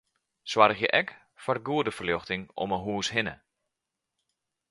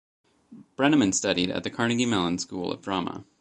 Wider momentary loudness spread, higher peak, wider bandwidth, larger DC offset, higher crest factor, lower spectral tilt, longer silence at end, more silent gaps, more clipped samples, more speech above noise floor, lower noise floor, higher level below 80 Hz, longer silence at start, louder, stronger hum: first, 13 LU vs 10 LU; first, -4 dBFS vs -8 dBFS; about the same, 11.5 kHz vs 11 kHz; neither; first, 26 dB vs 20 dB; about the same, -4 dB/octave vs -4 dB/octave; first, 1.35 s vs 0.2 s; neither; neither; first, 58 dB vs 26 dB; first, -86 dBFS vs -51 dBFS; about the same, -60 dBFS vs -58 dBFS; about the same, 0.45 s vs 0.5 s; about the same, -27 LUFS vs -25 LUFS; neither